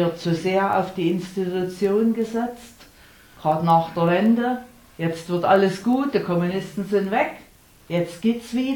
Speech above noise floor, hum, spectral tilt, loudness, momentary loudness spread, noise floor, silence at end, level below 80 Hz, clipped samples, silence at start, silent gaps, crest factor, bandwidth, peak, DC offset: 28 dB; none; -7 dB/octave; -22 LUFS; 9 LU; -50 dBFS; 0 s; -58 dBFS; under 0.1%; 0 s; none; 18 dB; 19 kHz; -4 dBFS; under 0.1%